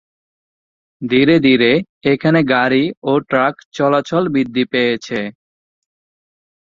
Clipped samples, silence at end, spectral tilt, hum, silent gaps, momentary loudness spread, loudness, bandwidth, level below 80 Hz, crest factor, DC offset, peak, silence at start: under 0.1%; 1.45 s; -6.5 dB/octave; none; 1.89-2.01 s, 2.97-3.02 s, 3.65-3.72 s; 9 LU; -15 LUFS; 7.4 kHz; -56 dBFS; 16 dB; under 0.1%; -2 dBFS; 1 s